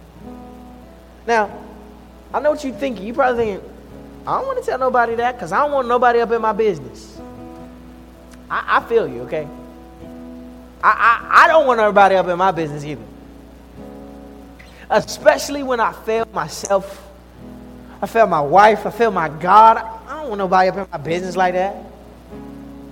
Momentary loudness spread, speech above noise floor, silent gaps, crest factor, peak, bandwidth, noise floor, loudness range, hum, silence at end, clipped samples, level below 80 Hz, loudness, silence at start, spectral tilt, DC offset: 25 LU; 25 dB; none; 18 dB; 0 dBFS; 17 kHz; -41 dBFS; 8 LU; none; 0 s; under 0.1%; -46 dBFS; -16 LUFS; 0.15 s; -4.5 dB/octave; under 0.1%